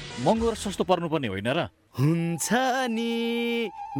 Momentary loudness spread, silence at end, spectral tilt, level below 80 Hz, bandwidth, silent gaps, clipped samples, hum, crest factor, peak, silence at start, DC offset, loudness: 5 LU; 0 s; -5 dB/octave; -50 dBFS; 18.5 kHz; none; under 0.1%; none; 20 dB; -6 dBFS; 0 s; under 0.1%; -26 LUFS